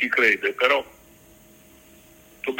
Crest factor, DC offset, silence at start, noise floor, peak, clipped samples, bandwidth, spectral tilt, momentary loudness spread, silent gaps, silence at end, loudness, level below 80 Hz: 24 dB; under 0.1%; 0 s; -52 dBFS; -2 dBFS; under 0.1%; 16.5 kHz; -2.5 dB/octave; 15 LU; none; 0 s; -21 LUFS; -62 dBFS